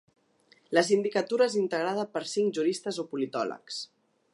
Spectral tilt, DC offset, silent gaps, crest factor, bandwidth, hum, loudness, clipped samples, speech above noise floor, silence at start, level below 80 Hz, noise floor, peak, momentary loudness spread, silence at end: -4 dB/octave; under 0.1%; none; 20 dB; 11.5 kHz; none; -29 LUFS; under 0.1%; 36 dB; 0.7 s; -84 dBFS; -64 dBFS; -8 dBFS; 11 LU; 0.5 s